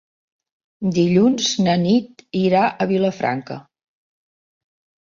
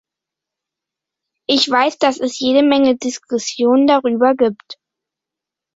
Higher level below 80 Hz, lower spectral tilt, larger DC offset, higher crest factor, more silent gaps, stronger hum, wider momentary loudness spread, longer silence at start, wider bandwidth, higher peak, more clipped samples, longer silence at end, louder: about the same, -58 dBFS vs -62 dBFS; first, -5.5 dB/octave vs -3 dB/octave; neither; about the same, 16 dB vs 16 dB; neither; neither; first, 12 LU vs 9 LU; second, 0.8 s vs 1.5 s; about the same, 7.6 kHz vs 8 kHz; about the same, -4 dBFS vs -2 dBFS; neither; first, 1.45 s vs 1.05 s; second, -19 LUFS vs -15 LUFS